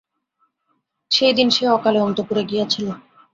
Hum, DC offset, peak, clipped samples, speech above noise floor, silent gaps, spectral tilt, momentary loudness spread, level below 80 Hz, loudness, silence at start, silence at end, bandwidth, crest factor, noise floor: none; under 0.1%; -2 dBFS; under 0.1%; 52 dB; none; -4.5 dB/octave; 8 LU; -62 dBFS; -18 LUFS; 1.1 s; 0.35 s; 7.8 kHz; 18 dB; -70 dBFS